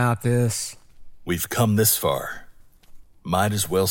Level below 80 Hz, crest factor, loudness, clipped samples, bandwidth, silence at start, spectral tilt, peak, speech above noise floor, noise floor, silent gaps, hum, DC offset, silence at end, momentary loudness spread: -50 dBFS; 18 dB; -22 LUFS; under 0.1%; 17 kHz; 0 s; -4.5 dB/octave; -6 dBFS; 24 dB; -46 dBFS; none; none; under 0.1%; 0 s; 17 LU